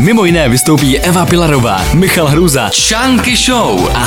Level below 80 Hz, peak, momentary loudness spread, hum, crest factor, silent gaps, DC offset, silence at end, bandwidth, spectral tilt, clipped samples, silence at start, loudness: -24 dBFS; 0 dBFS; 2 LU; none; 8 dB; none; under 0.1%; 0 s; 18 kHz; -4 dB/octave; under 0.1%; 0 s; -9 LUFS